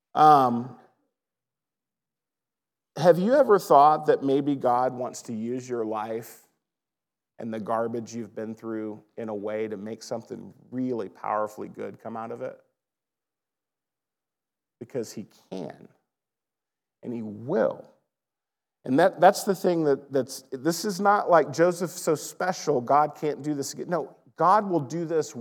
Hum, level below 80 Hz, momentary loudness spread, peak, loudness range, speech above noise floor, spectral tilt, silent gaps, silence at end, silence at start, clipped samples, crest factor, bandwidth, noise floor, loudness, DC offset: none; under -90 dBFS; 18 LU; -4 dBFS; 19 LU; over 65 dB; -5.5 dB/octave; none; 0 s; 0.15 s; under 0.1%; 22 dB; 19 kHz; under -90 dBFS; -25 LUFS; under 0.1%